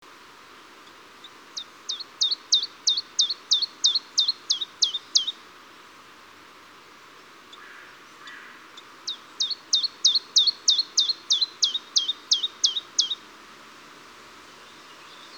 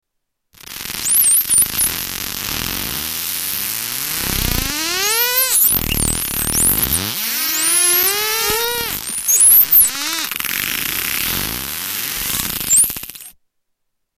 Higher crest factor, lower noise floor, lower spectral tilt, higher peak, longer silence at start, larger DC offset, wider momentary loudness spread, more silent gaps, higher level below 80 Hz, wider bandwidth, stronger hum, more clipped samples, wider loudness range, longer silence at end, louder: first, 22 dB vs 14 dB; second, -49 dBFS vs -74 dBFS; second, 3 dB/octave vs -0.5 dB/octave; about the same, -6 dBFS vs -4 dBFS; first, 1.25 s vs 0.7 s; neither; first, 24 LU vs 11 LU; neither; second, -78 dBFS vs -36 dBFS; first, over 20 kHz vs 18 kHz; neither; neither; first, 9 LU vs 6 LU; second, 0 s vs 0.85 s; second, -22 LUFS vs -14 LUFS